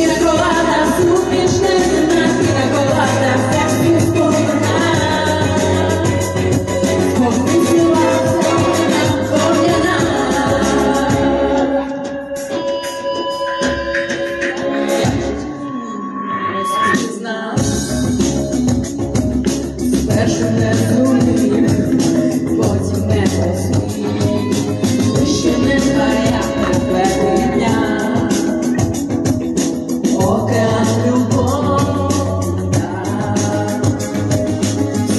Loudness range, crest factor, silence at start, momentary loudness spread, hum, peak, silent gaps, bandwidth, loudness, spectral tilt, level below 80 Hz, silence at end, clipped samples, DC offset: 5 LU; 10 dB; 0 s; 6 LU; none; -4 dBFS; none; 12.5 kHz; -15 LUFS; -5.5 dB/octave; -36 dBFS; 0 s; under 0.1%; under 0.1%